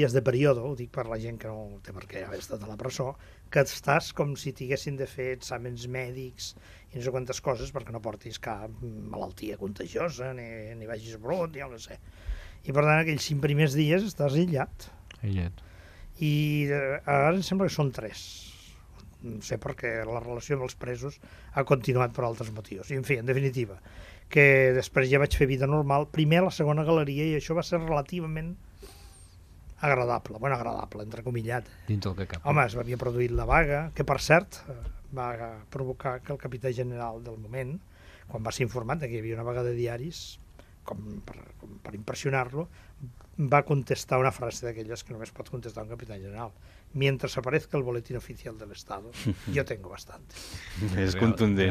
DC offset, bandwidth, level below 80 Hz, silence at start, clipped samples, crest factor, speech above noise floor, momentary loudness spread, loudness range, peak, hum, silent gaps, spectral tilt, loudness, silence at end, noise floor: under 0.1%; 15 kHz; -46 dBFS; 0 s; under 0.1%; 24 dB; 22 dB; 18 LU; 10 LU; -4 dBFS; none; none; -6 dB/octave; -29 LUFS; 0 s; -51 dBFS